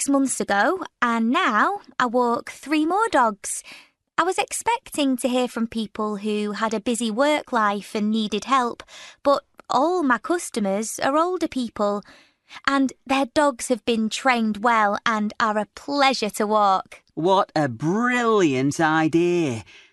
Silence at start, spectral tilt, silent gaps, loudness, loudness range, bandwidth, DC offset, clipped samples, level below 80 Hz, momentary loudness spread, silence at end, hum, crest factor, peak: 0 s; -4 dB/octave; none; -22 LUFS; 3 LU; 12.5 kHz; under 0.1%; under 0.1%; -62 dBFS; 8 LU; 0.3 s; none; 20 dB; -2 dBFS